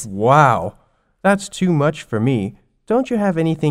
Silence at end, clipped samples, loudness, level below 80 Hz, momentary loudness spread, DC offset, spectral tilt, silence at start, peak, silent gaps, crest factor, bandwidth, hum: 0 s; under 0.1%; -17 LUFS; -50 dBFS; 9 LU; under 0.1%; -6.5 dB/octave; 0 s; 0 dBFS; none; 18 dB; 15 kHz; none